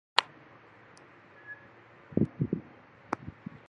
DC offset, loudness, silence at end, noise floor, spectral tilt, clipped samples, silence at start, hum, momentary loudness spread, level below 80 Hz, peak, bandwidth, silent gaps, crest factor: under 0.1%; -34 LUFS; 0.4 s; -56 dBFS; -5.5 dB/octave; under 0.1%; 0.15 s; none; 25 LU; -60 dBFS; 0 dBFS; 10.5 kHz; none; 36 dB